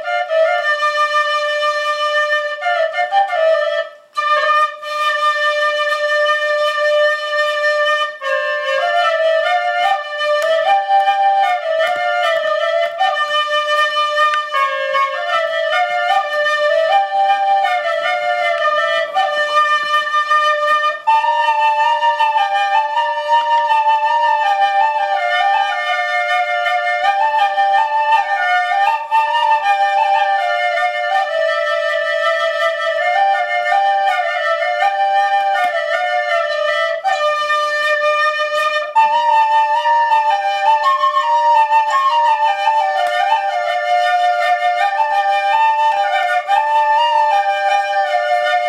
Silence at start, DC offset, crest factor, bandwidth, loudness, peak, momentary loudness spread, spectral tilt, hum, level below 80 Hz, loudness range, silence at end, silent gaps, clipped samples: 0 s; under 0.1%; 12 dB; 14 kHz; -15 LUFS; -2 dBFS; 3 LU; 1 dB/octave; none; -72 dBFS; 2 LU; 0 s; none; under 0.1%